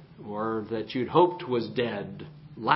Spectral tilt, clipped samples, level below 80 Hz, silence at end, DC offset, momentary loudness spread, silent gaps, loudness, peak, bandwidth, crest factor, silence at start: -10 dB/octave; under 0.1%; -62 dBFS; 0 s; under 0.1%; 17 LU; none; -28 LUFS; -4 dBFS; 5.8 kHz; 24 dB; 0 s